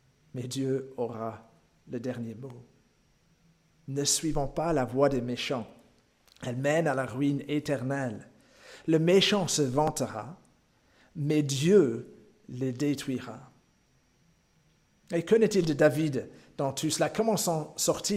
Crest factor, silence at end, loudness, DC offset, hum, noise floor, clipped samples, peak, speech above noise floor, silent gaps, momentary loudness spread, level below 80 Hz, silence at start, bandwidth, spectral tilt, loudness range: 20 dB; 0 s; -28 LUFS; under 0.1%; none; -67 dBFS; under 0.1%; -10 dBFS; 39 dB; none; 17 LU; -56 dBFS; 0.35 s; 16 kHz; -4.5 dB/octave; 9 LU